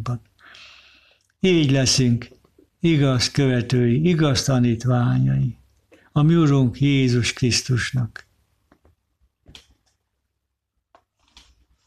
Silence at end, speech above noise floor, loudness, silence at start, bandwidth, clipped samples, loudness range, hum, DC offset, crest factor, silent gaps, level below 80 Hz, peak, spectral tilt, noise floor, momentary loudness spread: 3.8 s; 60 dB; -19 LUFS; 0 s; 13 kHz; under 0.1%; 7 LU; none; under 0.1%; 14 dB; none; -48 dBFS; -8 dBFS; -5.5 dB/octave; -78 dBFS; 9 LU